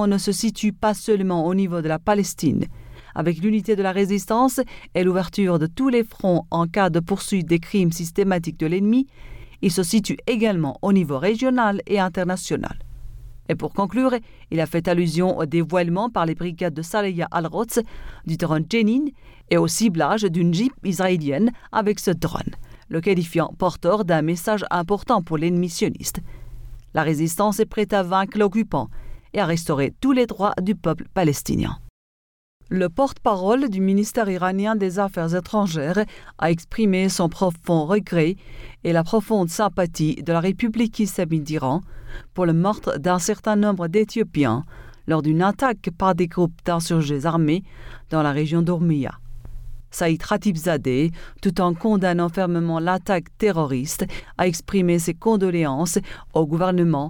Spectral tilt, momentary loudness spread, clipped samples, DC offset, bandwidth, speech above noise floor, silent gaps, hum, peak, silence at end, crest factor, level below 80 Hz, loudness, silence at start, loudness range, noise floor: -6 dB/octave; 6 LU; under 0.1%; under 0.1%; 19 kHz; over 69 dB; 31.90-32.60 s; none; -6 dBFS; 0 s; 16 dB; -44 dBFS; -22 LUFS; 0 s; 2 LU; under -90 dBFS